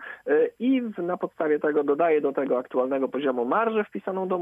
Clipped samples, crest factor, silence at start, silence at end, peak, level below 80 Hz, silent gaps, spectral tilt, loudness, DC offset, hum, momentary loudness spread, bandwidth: under 0.1%; 14 dB; 0 s; 0 s; -10 dBFS; -76 dBFS; none; -8.5 dB/octave; -25 LUFS; under 0.1%; none; 7 LU; 3.7 kHz